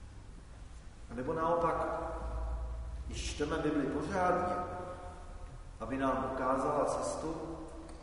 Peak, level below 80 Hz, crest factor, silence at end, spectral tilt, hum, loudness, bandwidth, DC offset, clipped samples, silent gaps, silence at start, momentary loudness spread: -18 dBFS; -46 dBFS; 18 dB; 0 s; -5.5 dB/octave; none; -35 LUFS; 10.5 kHz; under 0.1%; under 0.1%; none; 0 s; 20 LU